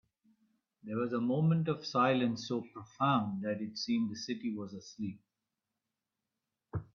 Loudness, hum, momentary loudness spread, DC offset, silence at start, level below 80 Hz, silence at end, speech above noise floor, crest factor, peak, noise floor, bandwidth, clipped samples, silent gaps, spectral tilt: -34 LUFS; none; 13 LU; under 0.1%; 0.85 s; -70 dBFS; 0.1 s; 55 dB; 20 dB; -16 dBFS; -89 dBFS; 7.2 kHz; under 0.1%; none; -6.5 dB/octave